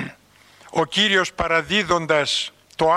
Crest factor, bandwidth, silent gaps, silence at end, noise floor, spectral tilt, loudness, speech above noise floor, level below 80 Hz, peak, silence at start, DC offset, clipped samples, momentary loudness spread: 18 dB; 13.5 kHz; none; 0 s; -52 dBFS; -3 dB/octave; -20 LUFS; 32 dB; -48 dBFS; -4 dBFS; 0 s; under 0.1%; under 0.1%; 10 LU